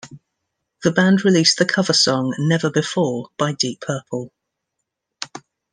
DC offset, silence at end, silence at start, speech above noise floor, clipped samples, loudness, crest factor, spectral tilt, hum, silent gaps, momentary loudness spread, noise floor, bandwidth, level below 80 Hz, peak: under 0.1%; 0.35 s; 0.05 s; 61 dB; under 0.1%; -18 LUFS; 18 dB; -4 dB/octave; none; none; 18 LU; -79 dBFS; 10 kHz; -64 dBFS; -2 dBFS